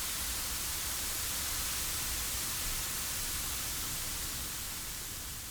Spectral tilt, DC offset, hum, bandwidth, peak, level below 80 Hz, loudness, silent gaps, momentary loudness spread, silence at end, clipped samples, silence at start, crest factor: -0.5 dB/octave; under 0.1%; none; over 20 kHz; -22 dBFS; -46 dBFS; -34 LUFS; none; 5 LU; 0 s; under 0.1%; 0 s; 16 dB